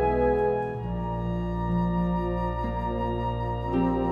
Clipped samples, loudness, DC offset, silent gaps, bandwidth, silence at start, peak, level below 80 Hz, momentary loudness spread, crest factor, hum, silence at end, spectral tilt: under 0.1%; -28 LUFS; under 0.1%; none; 5 kHz; 0 s; -12 dBFS; -36 dBFS; 6 LU; 14 dB; none; 0 s; -10 dB/octave